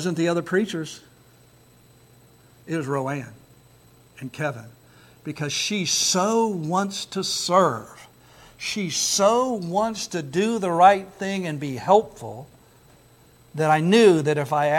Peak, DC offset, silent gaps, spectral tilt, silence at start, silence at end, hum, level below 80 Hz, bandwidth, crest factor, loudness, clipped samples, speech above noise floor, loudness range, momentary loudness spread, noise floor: -4 dBFS; under 0.1%; none; -4 dB/octave; 0 s; 0 s; none; -64 dBFS; 17 kHz; 20 dB; -22 LUFS; under 0.1%; 32 dB; 11 LU; 20 LU; -54 dBFS